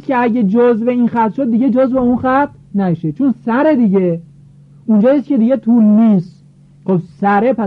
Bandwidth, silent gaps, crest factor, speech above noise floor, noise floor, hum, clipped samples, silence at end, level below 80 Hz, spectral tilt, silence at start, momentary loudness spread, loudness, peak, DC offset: 4.7 kHz; none; 10 dB; 29 dB; -42 dBFS; none; under 0.1%; 0 s; -50 dBFS; -10.5 dB/octave; 0.1 s; 7 LU; -13 LUFS; -4 dBFS; under 0.1%